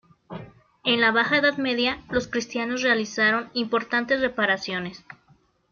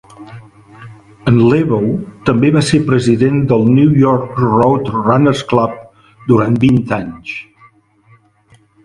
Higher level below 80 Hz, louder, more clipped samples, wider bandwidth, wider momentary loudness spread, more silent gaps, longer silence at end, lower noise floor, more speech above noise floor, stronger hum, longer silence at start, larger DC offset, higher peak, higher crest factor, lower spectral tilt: second, -58 dBFS vs -44 dBFS; second, -23 LUFS vs -12 LUFS; neither; second, 7.2 kHz vs 11.5 kHz; about the same, 13 LU vs 11 LU; neither; second, 0.6 s vs 1.45 s; first, -61 dBFS vs -50 dBFS; about the same, 37 dB vs 38 dB; neither; about the same, 0.3 s vs 0.2 s; neither; second, -8 dBFS vs 0 dBFS; about the same, 16 dB vs 14 dB; second, -3.5 dB/octave vs -7.5 dB/octave